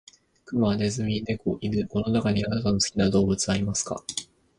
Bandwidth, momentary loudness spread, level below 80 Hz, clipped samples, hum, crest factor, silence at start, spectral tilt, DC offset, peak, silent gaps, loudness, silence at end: 11.5 kHz; 8 LU; -48 dBFS; under 0.1%; none; 18 dB; 0.5 s; -5 dB/octave; under 0.1%; -8 dBFS; none; -26 LUFS; 0.35 s